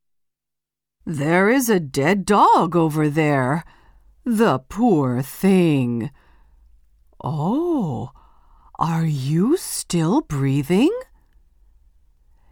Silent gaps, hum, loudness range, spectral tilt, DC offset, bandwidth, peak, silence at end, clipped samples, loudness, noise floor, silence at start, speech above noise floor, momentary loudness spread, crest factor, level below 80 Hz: none; none; 6 LU; -6.5 dB/octave; under 0.1%; 19.5 kHz; -2 dBFS; 1.5 s; under 0.1%; -19 LUFS; -83 dBFS; 1.05 s; 64 dB; 12 LU; 18 dB; -50 dBFS